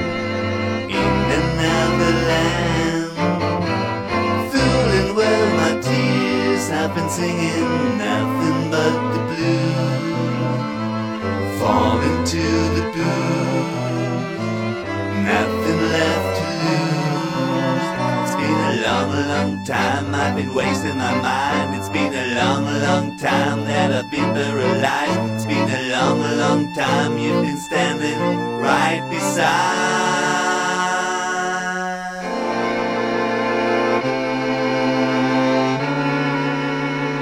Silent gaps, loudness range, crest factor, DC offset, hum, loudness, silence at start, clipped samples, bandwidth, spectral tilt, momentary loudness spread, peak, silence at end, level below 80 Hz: none; 2 LU; 18 dB; under 0.1%; none; -19 LUFS; 0 s; under 0.1%; 17 kHz; -5 dB/octave; 5 LU; 0 dBFS; 0 s; -42 dBFS